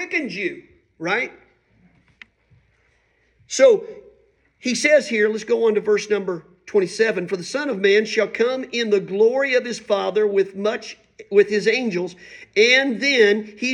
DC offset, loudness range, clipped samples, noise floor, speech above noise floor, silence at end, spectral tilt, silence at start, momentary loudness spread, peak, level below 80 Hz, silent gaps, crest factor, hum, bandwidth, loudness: under 0.1%; 5 LU; under 0.1%; -63 dBFS; 43 dB; 0 s; -3.5 dB/octave; 0 s; 13 LU; -2 dBFS; -68 dBFS; none; 18 dB; none; 11 kHz; -19 LUFS